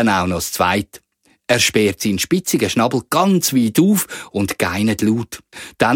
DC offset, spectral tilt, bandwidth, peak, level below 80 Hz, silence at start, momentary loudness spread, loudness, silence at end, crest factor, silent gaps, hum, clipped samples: under 0.1%; -4 dB/octave; 17.5 kHz; 0 dBFS; -48 dBFS; 0 s; 9 LU; -17 LUFS; 0 s; 18 dB; none; none; under 0.1%